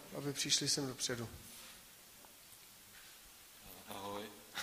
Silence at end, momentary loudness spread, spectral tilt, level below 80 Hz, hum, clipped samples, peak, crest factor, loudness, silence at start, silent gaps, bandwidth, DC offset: 0 s; 23 LU; -2 dB/octave; -70 dBFS; none; under 0.1%; -18 dBFS; 24 dB; -38 LUFS; 0 s; none; 15.5 kHz; under 0.1%